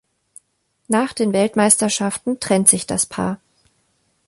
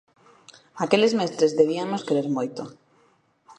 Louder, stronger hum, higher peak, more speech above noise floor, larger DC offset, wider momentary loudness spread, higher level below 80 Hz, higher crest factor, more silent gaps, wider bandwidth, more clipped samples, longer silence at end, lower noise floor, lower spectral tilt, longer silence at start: first, -17 LUFS vs -23 LUFS; neither; first, 0 dBFS vs -4 dBFS; first, 49 dB vs 40 dB; neither; about the same, 10 LU vs 12 LU; first, -56 dBFS vs -72 dBFS; about the same, 20 dB vs 22 dB; neither; first, 15.5 kHz vs 10.5 kHz; neither; first, 0.9 s vs 0.05 s; first, -67 dBFS vs -63 dBFS; second, -3.5 dB/octave vs -5 dB/octave; first, 0.9 s vs 0.75 s